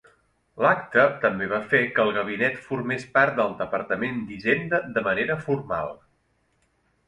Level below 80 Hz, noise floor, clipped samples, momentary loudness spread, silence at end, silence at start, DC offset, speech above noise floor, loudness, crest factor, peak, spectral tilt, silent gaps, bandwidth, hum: -60 dBFS; -68 dBFS; under 0.1%; 8 LU; 1.15 s; 0.55 s; under 0.1%; 44 dB; -24 LUFS; 20 dB; -4 dBFS; -6.5 dB/octave; none; 10.5 kHz; none